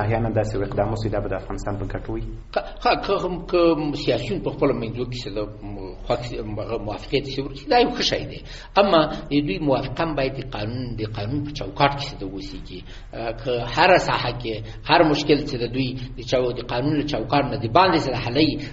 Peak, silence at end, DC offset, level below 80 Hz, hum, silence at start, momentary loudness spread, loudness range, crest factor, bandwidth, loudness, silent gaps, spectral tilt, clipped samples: 0 dBFS; 0 s; under 0.1%; -38 dBFS; none; 0 s; 13 LU; 6 LU; 22 dB; 8 kHz; -23 LUFS; none; -4 dB/octave; under 0.1%